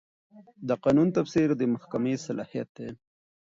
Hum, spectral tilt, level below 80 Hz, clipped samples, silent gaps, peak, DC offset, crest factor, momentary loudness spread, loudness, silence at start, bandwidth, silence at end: none; -7.5 dB/octave; -62 dBFS; under 0.1%; 2.69-2.75 s; -12 dBFS; under 0.1%; 16 dB; 16 LU; -27 LUFS; 0.35 s; 7.8 kHz; 0.5 s